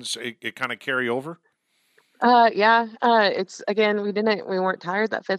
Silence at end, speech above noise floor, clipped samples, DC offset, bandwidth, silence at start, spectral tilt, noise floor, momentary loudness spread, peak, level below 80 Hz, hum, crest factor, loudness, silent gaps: 0 s; 46 dB; under 0.1%; under 0.1%; 13 kHz; 0 s; -4 dB/octave; -68 dBFS; 12 LU; -4 dBFS; -82 dBFS; none; 18 dB; -22 LUFS; none